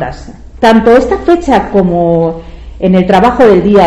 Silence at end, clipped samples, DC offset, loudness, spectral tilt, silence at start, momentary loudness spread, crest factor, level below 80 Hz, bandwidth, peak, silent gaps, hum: 0 s; 1%; under 0.1%; -8 LUFS; -7.5 dB/octave; 0 s; 10 LU; 8 dB; -28 dBFS; 10.5 kHz; 0 dBFS; none; none